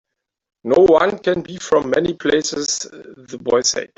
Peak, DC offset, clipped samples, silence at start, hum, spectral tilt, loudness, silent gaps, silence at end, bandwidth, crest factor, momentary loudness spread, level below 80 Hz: -2 dBFS; under 0.1%; under 0.1%; 0.65 s; none; -3 dB/octave; -17 LUFS; none; 0.1 s; 8.4 kHz; 16 dB; 15 LU; -52 dBFS